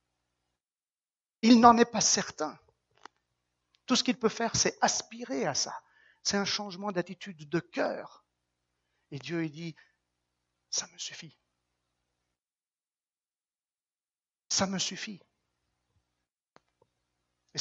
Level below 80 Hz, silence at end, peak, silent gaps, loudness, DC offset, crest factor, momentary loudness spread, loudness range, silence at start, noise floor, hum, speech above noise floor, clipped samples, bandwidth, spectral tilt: -68 dBFS; 0 s; -4 dBFS; none; -28 LUFS; under 0.1%; 28 dB; 19 LU; 15 LU; 1.45 s; under -90 dBFS; none; over 61 dB; under 0.1%; 8 kHz; -3 dB/octave